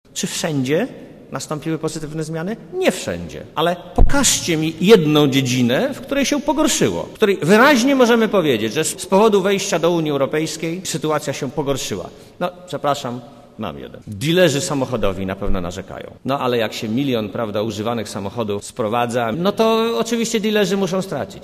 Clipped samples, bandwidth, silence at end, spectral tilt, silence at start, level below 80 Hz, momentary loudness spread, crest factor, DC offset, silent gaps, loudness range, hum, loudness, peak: under 0.1%; 15.5 kHz; 0 s; -4.5 dB/octave; 0.15 s; -34 dBFS; 13 LU; 18 dB; under 0.1%; none; 8 LU; none; -18 LUFS; 0 dBFS